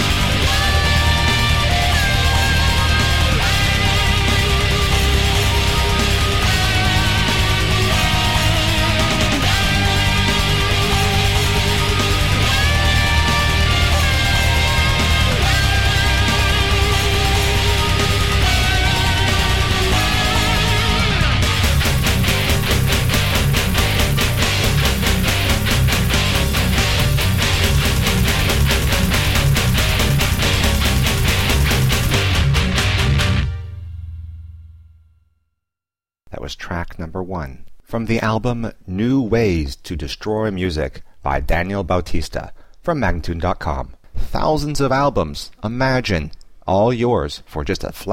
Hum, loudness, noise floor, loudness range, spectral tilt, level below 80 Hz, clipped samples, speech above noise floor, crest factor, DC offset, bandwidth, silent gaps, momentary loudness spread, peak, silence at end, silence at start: none; -16 LUFS; under -90 dBFS; 7 LU; -4 dB/octave; -22 dBFS; under 0.1%; over 71 dB; 12 dB; 2%; 16.5 kHz; none; 10 LU; -4 dBFS; 0 s; 0 s